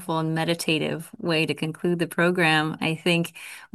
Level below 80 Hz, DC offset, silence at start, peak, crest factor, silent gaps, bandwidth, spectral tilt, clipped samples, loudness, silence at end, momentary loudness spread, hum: -68 dBFS; under 0.1%; 0 s; -8 dBFS; 18 dB; none; 12.5 kHz; -5 dB/octave; under 0.1%; -24 LUFS; 0.1 s; 9 LU; none